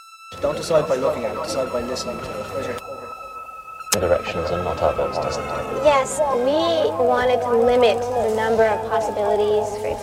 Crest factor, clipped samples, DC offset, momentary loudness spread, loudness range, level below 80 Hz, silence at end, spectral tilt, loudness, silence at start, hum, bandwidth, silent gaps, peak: 20 dB; under 0.1%; under 0.1%; 12 LU; 6 LU; -46 dBFS; 0 s; -4 dB/octave; -21 LUFS; 0 s; none; 16.5 kHz; none; 0 dBFS